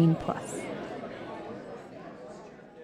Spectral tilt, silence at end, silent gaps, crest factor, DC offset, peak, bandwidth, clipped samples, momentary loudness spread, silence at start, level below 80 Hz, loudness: -7 dB/octave; 0 s; none; 20 dB; under 0.1%; -14 dBFS; 11.5 kHz; under 0.1%; 14 LU; 0 s; -62 dBFS; -36 LUFS